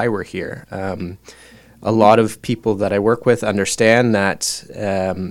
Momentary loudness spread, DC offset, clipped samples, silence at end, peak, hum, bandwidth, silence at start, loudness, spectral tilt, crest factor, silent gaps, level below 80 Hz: 14 LU; under 0.1%; under 0.1%; 0 s; 0 dBFS; none; 16.5 kHz; 0 s; -17 LUFS; -5 dB/octave; 18 dB; none; -50 dBFS